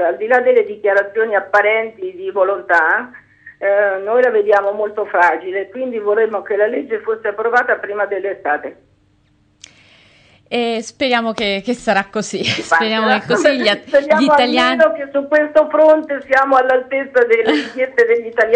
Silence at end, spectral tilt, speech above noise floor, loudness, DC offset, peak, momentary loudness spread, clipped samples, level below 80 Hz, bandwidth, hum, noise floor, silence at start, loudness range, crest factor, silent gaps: 0 s; -4 dB/octave; 41 dB; -15 LUFS; under 0.1%; -2 dBFS; 9 LU; under 0.1%; -58 dBFS; 9.6 kHz; none; -56 dBFS; 0 s; 8 LU; 14 dB; none